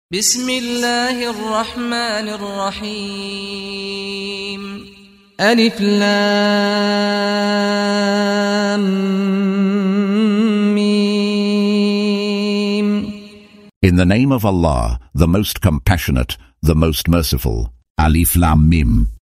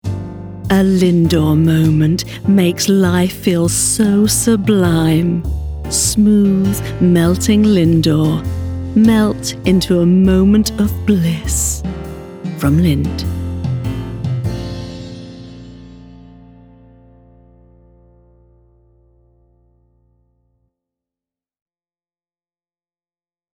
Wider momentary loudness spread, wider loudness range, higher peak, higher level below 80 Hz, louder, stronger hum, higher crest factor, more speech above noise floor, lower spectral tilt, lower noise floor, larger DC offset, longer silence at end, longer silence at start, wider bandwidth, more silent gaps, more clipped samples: second, 11 LU vs 14 LU; second, 6 LU vs 11 LU; about the same, 0 dBFS vs 0 dBFS; first, -26 dBFS vs -32 dBFS; about the same, -16 LUFS vs -14 LUFS; neither; about the same, 16 dB vs 14 dB; second, 24 dB vs over 78 dB; about the same, -5 dB/octave vs -5.5 dB/octave; second, -40 dBFS vs under -90 dBFS; neither; second, 0.1 s vs 7.45 s; about the same, 0.1 s vs 0.05 s; second, 16 kHz vs 19 kHz; first, 13.76-13.81 s, 17.90-17.95 s vs none; neither